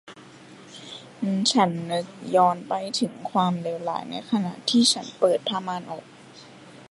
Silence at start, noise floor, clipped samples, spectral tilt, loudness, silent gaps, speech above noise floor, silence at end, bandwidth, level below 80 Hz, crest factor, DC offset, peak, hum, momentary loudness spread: 0.05 s; -47 dBFS; under 0.1%; -4 dB/octave; -24 LUFS; none; 23 dB; 0.05 s; 11.5 kHz; -74 dBFS; 20 dB; under 0.1%; -6 dBFS; none; 18 LU